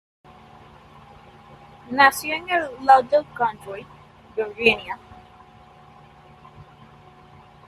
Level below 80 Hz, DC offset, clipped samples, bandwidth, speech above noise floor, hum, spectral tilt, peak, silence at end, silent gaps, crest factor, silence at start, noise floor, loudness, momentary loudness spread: -58 dBFS; under 0.1%; under 0.1%; 14 kHz; 28 dB; none; -3 dB/octave; -2 dBFS; 1.05 s; none; 24 dB; 1.9 s; -49 dBFS; -20 LUFS; 20 LU